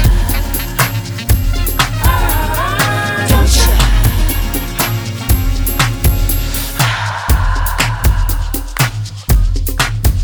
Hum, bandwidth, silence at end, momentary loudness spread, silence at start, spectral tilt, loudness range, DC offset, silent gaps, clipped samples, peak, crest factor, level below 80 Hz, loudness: none; over 20 kHz; 0 s; 6 LU; 0 s; -4 dB/octave; 2 LU; under 0.1%; none; under 0.1%; 0 dBFS; 12 dB; -16 dBFS; -14 LUFS